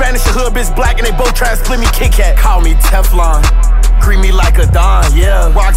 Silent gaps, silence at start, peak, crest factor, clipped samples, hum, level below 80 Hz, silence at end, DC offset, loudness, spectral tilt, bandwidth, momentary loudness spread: none; 0 s; 0 dBFS; 6 dB; under 0.1%; none; -8 dBFS; 0 s; under 0.1%; -11 LUFS; -4.5 dB/octave; 16 kHz; 4 LU